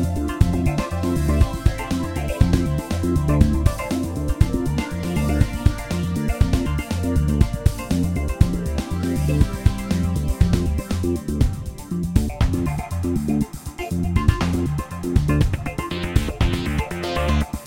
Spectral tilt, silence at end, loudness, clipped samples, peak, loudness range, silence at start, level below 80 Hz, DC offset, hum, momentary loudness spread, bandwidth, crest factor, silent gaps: -6.5 dB/octave; 0 s; -22 LUFS; under 0.1%; 0 dBFS; 2 LU; 0 s; -26 dBFS; 0.2%; none; 6 LU; 17 kHz; 20 dB; none